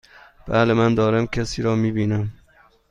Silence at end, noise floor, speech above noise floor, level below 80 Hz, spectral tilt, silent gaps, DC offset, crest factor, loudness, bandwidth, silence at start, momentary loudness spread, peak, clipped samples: 0.6 s; -55 dBFS; 36 dB; -42 dBFS; -7 dB/octave; none; under 0.1%; 18 dB; -20 LUFS; 10 kHz; 0.45 s; 7 LU; -2 dBFS; under 0.1%